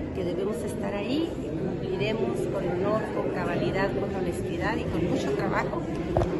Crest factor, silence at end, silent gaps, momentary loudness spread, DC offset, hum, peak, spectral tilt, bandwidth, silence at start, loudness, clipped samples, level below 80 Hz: 18 dB; 0 s; none; 4 LU; under 0.1%; none; -8 dBFS; -7 dB/octave; 12 kHz; 0 s; -28 LUFS; under 0.1%; -44 dBFS